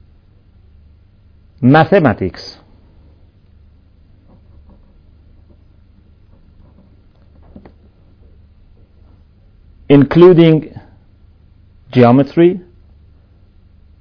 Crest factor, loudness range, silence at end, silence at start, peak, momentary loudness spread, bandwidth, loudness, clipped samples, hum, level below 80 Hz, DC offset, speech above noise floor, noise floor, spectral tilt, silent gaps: 16 dB; 8 LU; 1.4 s; 1.6 s; 0 dBFS; 19 LU; 5.4 kHz; -10 LUFS; 0.5%; none; -44 dBFS; under 0.1%; 38 dB; -47 dBFS; -9.5 dB/octave; none